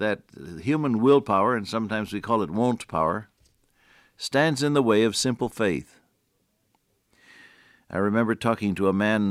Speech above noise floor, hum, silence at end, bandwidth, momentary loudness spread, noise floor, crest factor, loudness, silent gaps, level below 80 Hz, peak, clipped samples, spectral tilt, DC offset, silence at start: 47 dB; none; 0 s; 15 kHz; 11 LU; -71 dBFS; 18 dB; -24 LUFS; none; -60 dBFS; -8 dBFS; under 0.1%; -5.5 dB/octave; under 0.1%; 0 s